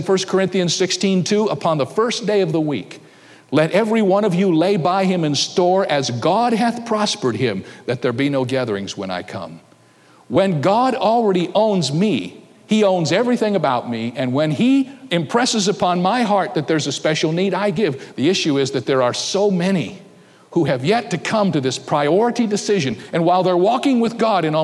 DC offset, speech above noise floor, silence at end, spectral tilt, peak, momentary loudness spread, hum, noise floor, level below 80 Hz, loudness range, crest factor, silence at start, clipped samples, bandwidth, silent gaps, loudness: under 0.1%; 33 dB; 0 s; -5 dB/octave; -4 dBFS; 6 LU; none; -50 dBFS; -64 dBFS; 3 LU; 14 dB; 0 s; under 0.1%; 12 kHz; none; -18 LUFS